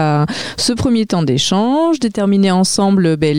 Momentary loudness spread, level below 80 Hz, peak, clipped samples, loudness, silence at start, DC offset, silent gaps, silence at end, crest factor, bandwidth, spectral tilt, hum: 4 LU; -42 dBFS; -4 dBFS; under 0.1%; -14 LUFS; 0 s; 0.7%; none; 0 s; 10 dB; 15.5 kHz; -5 dB/octave; none